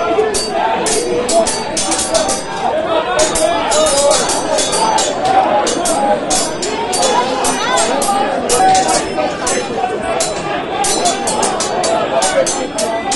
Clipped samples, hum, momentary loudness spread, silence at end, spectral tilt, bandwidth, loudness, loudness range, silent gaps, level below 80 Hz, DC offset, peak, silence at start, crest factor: under 0.1%; none; 5 LU; 0 s; -2 dB/octave; 12 kHz; -14 LUFS; 2 LU; none; -40 dBFS; under 0.1%; 0 dBFS; 0 s; 14 dB